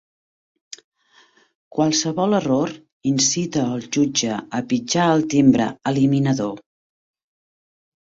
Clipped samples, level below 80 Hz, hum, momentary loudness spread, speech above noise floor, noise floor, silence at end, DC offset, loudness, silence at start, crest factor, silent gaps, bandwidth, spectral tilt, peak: under 0.1%; -58 dBFS; none; 13 LU; 37 dB; -56 dBFS; 1.4 s; under 0.1%; -20 LUFS; 1.75 s; 18 dB; 2.92-3.00 s; 8 kHz; -4.5 dB/octave; -2 dBFS